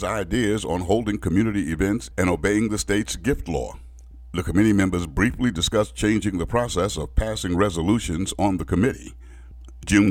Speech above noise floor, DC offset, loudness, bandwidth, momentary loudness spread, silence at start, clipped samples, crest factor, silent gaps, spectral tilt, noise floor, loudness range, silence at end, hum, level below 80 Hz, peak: 20 dB; under 0.1%; -23 LUFS; 16.5 kHz; 6 LU; 0 s; under 0.1%; 18 dB; none; -5.5 dB/octave; -42 dBFS; 2 LU; 0 s; none; -34 dBFS; -6 dBFS